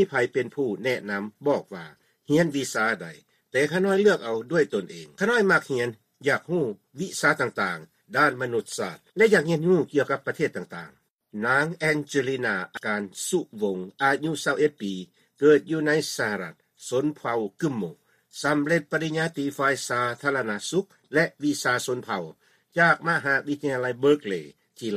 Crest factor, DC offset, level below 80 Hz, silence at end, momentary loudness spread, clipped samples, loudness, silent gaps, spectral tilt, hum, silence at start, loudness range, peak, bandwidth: 20 dB; under 0.1%; -70 dBFS; 0 s; 12 LU; under 0.1%; -25 LUFS; 11.10-11.19 s; -5 dB/octave; none; 0 s; 3 LU; -6 dBFS; 15 kHz